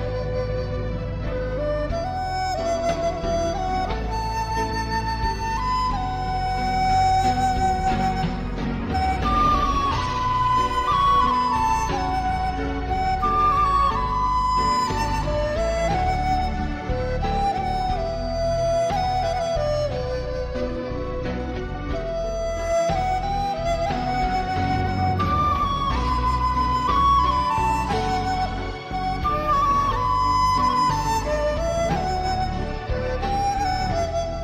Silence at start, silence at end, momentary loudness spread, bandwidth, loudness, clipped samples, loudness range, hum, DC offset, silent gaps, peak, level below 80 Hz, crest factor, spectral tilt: 0 s; 0 s; 8 LU; 15 kHz; -23 LUFS; under 0.1%; 4 LU; none; under 0.1%; none; -8 dBFS; -30 dBFS; 14 dB; -5.5 dB/octave